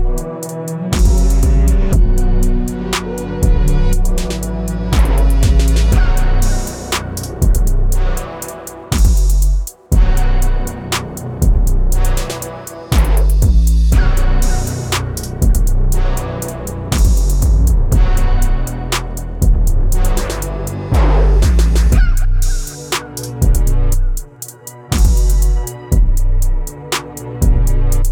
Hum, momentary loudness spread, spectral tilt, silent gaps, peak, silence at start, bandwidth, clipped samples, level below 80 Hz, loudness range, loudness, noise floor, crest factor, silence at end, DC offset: none; 10 LU; -5.5 dB/octave; none; -2 dBFS; 0 s; 17.5 kHz; under 0.1%; -12 dBFS; 3 LU; -16 LUFS; -32 dBFS; 10 dB; 0 s; under 0.1%